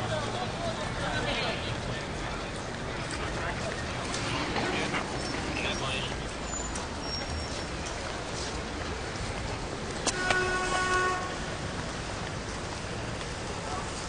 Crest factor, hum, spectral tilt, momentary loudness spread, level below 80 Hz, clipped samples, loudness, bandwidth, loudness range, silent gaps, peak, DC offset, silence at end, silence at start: 24 dB; none; -3.5 dB/octave; 8 LU; -44 dBFS; under 0.1%; -32 LUFS; 10 kHz; 4 LU; none; -8 dBFS; 0.1%; 0 s; 0 s